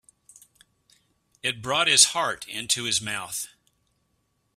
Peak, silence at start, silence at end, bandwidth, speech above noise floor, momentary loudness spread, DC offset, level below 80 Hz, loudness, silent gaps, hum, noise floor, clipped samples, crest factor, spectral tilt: -2 dBFS; 1.45 s; 1.1 s; 15.5 kHz; 48 dB; 16 LU; under 0.1%; -66 dBFS; -22 LUFS; none; none; -72 dBFS; under 0.1%; 26 dB; 0 dB/octave